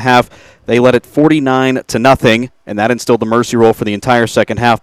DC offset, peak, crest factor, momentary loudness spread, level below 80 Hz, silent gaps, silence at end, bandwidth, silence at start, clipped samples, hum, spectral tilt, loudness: under 0.1%; 0 dBFS; 12 dB; 6 LU; -42 dBFS; none; 0.05 s; 15.5 kHz; 0 s; 0.7%; none; -5.5 dB/octave; -12 LUFS